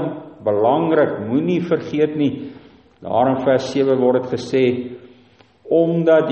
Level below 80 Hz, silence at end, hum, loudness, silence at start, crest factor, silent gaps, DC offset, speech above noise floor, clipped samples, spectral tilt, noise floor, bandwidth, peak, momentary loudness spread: -60 dBFS; 0 s; none; -18 LUFS; 0 s; 16 dB; none; under 0.1%; 34 dB; under 0.1%; -7.5 dB/octave; -51 dBFS; 8.2 kHz; -2 dBFS; 11 LU